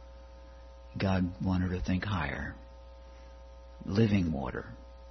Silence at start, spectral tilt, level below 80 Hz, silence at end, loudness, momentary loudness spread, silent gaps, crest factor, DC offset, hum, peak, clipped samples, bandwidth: 0 s; -7.5 dB/octave; -48 dBFS; 0 s; -32 LUFS; 24 LU; none; 20 dB; under 0.1%; none; -14 dBFS; under 0.1%; 6.4 kHz